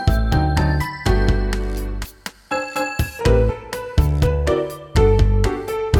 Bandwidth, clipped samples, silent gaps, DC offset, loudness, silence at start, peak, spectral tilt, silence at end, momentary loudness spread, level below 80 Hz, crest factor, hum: 17.5 kHz; under 0.1%; none; under 0.1%; -20 LUFS; 0 s; -2 dBFS; -6.5 dB/octave; 0 s; 10 LU; -22 dBFS; 16 dB; none